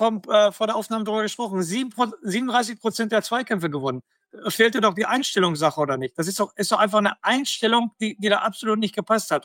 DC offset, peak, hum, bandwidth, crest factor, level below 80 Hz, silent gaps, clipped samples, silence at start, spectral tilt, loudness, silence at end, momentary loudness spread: under 0.1%; -4 dBFS; none; 17 kHz; 18 dB; -74 dBFS; none; under 0.1%; 0 s; -4 dB/octave; -22 LUFS; 0.05 s; 7 LU